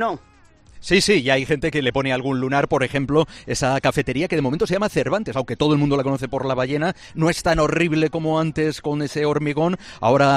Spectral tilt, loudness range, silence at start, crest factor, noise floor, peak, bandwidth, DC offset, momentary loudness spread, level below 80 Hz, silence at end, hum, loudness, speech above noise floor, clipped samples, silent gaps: -5.5 dB/octave; 1 LU; 0 s; 18 dB; -47 dBFS; -2 dBFS; 14 kHz; under 0.1%; 6 LU; -44 dBFS; 0 s; none; -20 LUFS; 27 dB; under 0.1%; none